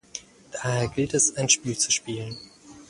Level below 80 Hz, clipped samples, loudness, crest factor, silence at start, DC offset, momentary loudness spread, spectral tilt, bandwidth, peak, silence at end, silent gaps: -56 dBFS; under 0.1%; -23 LUFS; 22 dB; 0.15 s; under 0.1%; 18 LU; -2.5 dB/octave; 11.5 kHz; -6 dBFS; 0.05 s; none